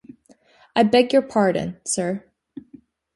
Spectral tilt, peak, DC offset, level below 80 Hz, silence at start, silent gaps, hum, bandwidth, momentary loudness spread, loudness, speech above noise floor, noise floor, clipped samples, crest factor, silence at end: -4.5 dB/octave; -2 dBFS; under 0.1%; -60 dBFS; 0.75 s; none; none; 11.5 kHz; 17 LU; -20 LUFS; 36 dB; -55 dBFS; under 0.1%; 20 dB; 0.55 s